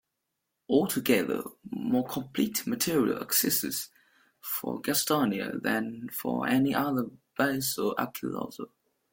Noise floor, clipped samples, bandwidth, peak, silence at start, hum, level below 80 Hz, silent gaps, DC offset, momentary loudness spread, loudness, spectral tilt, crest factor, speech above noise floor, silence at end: -83 dBFS; under 0.1%; 17 kHz; -10 dBFS; 0.7 s; none; -68 dBFS; none; under 0.1%; 10 LU; -29 LUFS; -4 dB/octave; 20 dB; 54 dB; 0.45 s